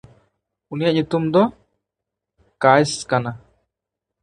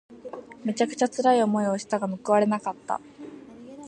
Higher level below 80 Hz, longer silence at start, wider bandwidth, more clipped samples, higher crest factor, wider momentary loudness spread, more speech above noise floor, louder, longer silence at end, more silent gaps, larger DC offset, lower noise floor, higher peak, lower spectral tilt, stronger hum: first, -58 dBFS vs -72 dBFS; first, 0.7 s vs 0.1 s; first, 11.5 kHz vs 10 kHz; neither; about the same, 22 dB vs 18 dB; second, 15 LU vs 22 LU; first, 66 dB vs 20 dB; first, -19 LUFS vs -25 LUFS; first, 0.85 s vs 0 s; neither; neither; first, -84 dBFS vs -44 dBFS; first, 0 dBFS vs -8 dBFS; about the same, -5.5 dB/octave vs -5.5 dB/octave; neither